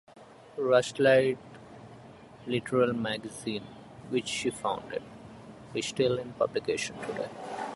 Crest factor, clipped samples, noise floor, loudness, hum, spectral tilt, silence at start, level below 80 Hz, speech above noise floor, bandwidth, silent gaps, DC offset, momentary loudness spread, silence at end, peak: 22 dB; under 0.1%; -50 dBFS; -30 LUFS; none; -4.5 dB/octave; 0.1 s; -64 dBFS; 21 dB; 11.5 kHz; none; under 0.1%; 24 LU; 0 s; -10 dBFS